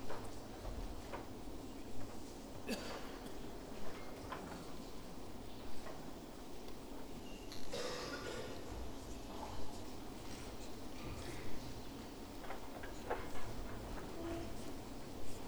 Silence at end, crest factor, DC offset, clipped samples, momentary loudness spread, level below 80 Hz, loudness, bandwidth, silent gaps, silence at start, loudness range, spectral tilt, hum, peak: 0 s; 16 dB; 0.3%; under 0.1%; 7 LU; -54 dBFS; -49 LUFS; over 20 kHz; none; 0 s; 3 LU; -4.5 dB/octave; none; -26 dBFS